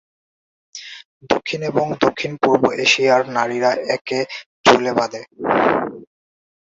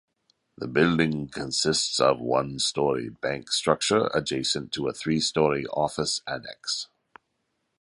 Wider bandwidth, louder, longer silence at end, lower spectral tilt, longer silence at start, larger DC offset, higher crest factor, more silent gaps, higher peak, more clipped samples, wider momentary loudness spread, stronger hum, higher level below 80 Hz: second, 7.8 kHz vs 11.5 kHz; first, -18 LUFS vs -25 LUFS; second, 0.7 s vs 0.95 s; about the same, -4 dB/octave vs -3.5 dB/octave; first, 0.75 s vs 0.6 s; neither; about the same, 20 dB vs 22 dB; first, 1.05-1.20 s, 4.01-4.05 s, 4.46-4.64 s vs none; first, 0 dBFS vs -4 dBFS; neither; first, 15 LU vs 9 LU; neither; about the same, -58 dBFS vs -56 dBFS